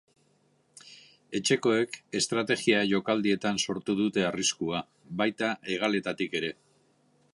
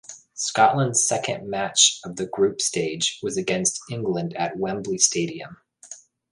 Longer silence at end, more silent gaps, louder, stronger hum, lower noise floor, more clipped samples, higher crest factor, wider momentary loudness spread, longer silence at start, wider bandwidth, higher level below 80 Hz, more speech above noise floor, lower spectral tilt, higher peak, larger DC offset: first, 0.8 s vs 0.35 s; neither; second, -28 LUFS vs -22 LUFS; neither; first, -68 dBFS vs -46 dBFS; neither; about the same, 20 dB vs 22 dB; second, 8 LU vs 20 LU; first, 0.85 s vs 0.1 s; about the same, 11.5 kHz vs 11.5 kHz; second, -68 dBFS vs -62 dBFS; first, 40 dB vs 22 dB; about the same, -3.5 dB/octave vs -2.5 dB/octave; second, -10 dBFS vs -2 dBFS; neither